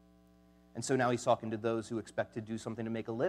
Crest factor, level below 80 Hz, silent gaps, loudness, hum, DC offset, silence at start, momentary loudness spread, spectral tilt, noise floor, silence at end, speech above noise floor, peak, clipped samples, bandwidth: 20 dB; -70 dBFS; none; -35 LUFS; none; under 0.1%; 0.75 s; 10 LU; -5.5 dB/octave; -63 dBFS; 0 s; 29 dB; -16 dBFS; under 0.1%; 13.5 kHz